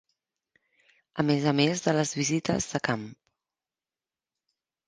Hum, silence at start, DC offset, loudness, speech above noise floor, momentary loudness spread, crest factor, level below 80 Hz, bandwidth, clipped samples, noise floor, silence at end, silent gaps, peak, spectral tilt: none; 1.15 s; under 0.1%; -27 LUFS; over 64 dB; 9 LU; 22 dB; -62 dBFS; 10 kHz; under 0.1%; under -90 dBFS; 1.75 s; none; -8 dBFS; -4.5 dB/octave